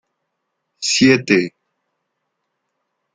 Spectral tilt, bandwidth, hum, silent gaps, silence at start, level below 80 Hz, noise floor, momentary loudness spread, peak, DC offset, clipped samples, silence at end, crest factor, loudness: -3.5 dB/octave; 9.6 kHz; none; none; 0.8 s; -60 dBFS; -75 dBFS; 12 LU; -2 dBFS; under 0.1%; under 0.1%; 1.65 s; 20 dB; -15 LUFS